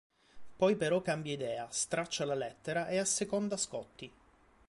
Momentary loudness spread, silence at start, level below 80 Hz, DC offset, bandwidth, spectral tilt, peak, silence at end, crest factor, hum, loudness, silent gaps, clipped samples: 8 LU; 0.35 s; -70 dBFS; under 0.1%; 11.5 kHz; -3.5 dB/octave; -16 dBFS; 0.6 s; 20 dB; none; -34 LUFS; none; under 0.1%